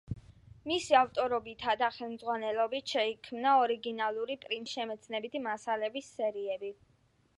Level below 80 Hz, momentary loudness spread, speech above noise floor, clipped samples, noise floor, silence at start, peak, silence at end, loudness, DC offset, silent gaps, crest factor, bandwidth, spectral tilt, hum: -64 dBFS; 11 LU; 37 dB; under 0.1%; -69 dBFS; 0.1 s; -12 dBFS; 0.65 s; -32 LUFS; under 0.1%; none; 22 dB; 11.5 kHz; -4 dB/octave; none